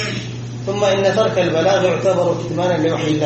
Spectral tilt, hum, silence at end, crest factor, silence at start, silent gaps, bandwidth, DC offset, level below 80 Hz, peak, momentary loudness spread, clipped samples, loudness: -5.5 dB/octave; 60 Hz at -30 dBFS; 0 s; 14 dB; 0 s; none; 8.4 kHz; under 0.1%; -50 dBFS; -4 dBFS; 9 LU; under 0.1%; -17 LUFS